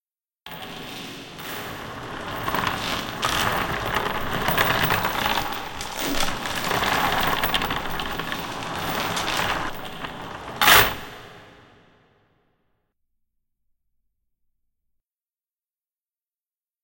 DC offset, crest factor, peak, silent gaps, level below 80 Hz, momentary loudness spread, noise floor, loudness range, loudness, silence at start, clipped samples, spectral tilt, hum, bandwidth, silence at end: under 0.1%; 24 dB; -2 dBFS; none; -42 dBFS; 15 LU; under -90 dBFS; 5 LU; -23 LUFS; 0.45 s; under 0.1%; -2.5 dB/octave; none; 17.5 kHz; 5.25 s